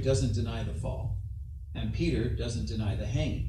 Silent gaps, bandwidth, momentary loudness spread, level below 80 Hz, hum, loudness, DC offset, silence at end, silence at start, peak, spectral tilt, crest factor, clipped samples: none; 11 kHz; 9 LU; -38 dBFS; none; -32 LUFS; under 0.1%; 0 s; 0 s; -14 dBFS; -6.5 dB/octave; 16 dB; under 0.1%